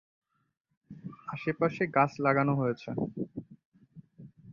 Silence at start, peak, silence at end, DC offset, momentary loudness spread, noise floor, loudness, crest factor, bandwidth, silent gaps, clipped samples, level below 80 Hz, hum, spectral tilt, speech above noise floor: 0.9 s; -10 dBFS; 0 s; under 0.1%; 18 LU; -55 dBFS; -30 LUFS; 22 dB; 7.2 kHz; 3.65-3.72 s; under 0.1%; -68 dBFS; none; -8.5 dB/octave; 26 dB